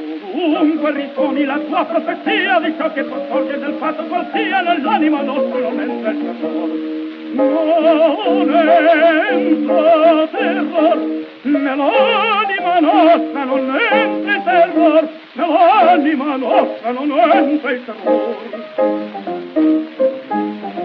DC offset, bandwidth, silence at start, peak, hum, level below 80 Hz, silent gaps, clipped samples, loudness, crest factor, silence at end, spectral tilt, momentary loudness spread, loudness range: under 0.1%; 5.4 kHz; 0 s; 0 dBFS; none; -72 dBFS; none; under 0.1%; -15 LUFS; 14 dB; 0 s; -7 dB/octave; 10 LU; 5 LU